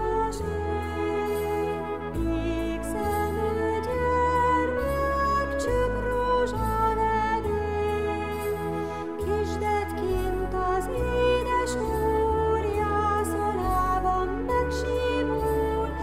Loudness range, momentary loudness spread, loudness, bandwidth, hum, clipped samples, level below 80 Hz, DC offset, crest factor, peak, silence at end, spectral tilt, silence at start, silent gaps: 3 LU; 5 LU; -26 LUFS; 15.5 kHz; none; under 0.1%; -36 dBFS; 0.5%; 12 dB; -14 dBFS; 0 s; -6 dB/octave; 0 s; none